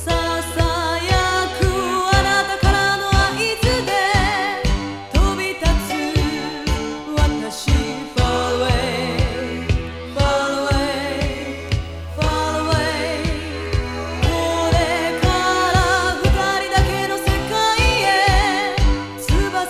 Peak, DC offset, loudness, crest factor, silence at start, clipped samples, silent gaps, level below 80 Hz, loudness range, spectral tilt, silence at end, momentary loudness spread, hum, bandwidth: -2 dBFS; under 0.1%; -19 LUFS; 18 dB; 0 s; under 0.1%; none; -24 dBFS; 4 LU; -4.5 dB/octave; 0 s; 8 LU; none; 15.5 kHz